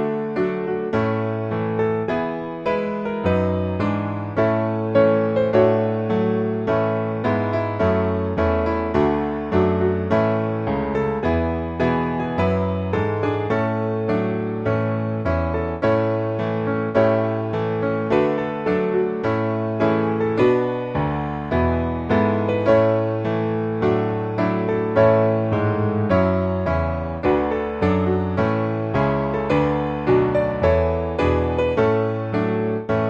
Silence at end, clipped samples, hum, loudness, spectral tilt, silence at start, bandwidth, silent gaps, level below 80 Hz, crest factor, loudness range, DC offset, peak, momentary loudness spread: 0 s; under 0.1%; none; -21 LUFS; -9 dB/octave; 0 s; 7.2 kHz; none; -40 dBFS; 16 dB; 2 LU; under 0.1%; -4 dBFS; 5 LU